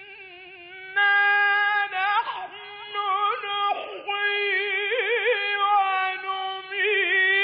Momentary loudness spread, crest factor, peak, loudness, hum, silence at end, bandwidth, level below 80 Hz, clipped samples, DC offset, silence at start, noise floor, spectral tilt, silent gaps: 18 LU; 12 dB; -12 dBFS; -23 LUFS; none; 0 s; 5.2 kHz; -76 dBFS; under 0.1%; under 0.1%; 0 s; -44 dBFS; 4 dB/octave; none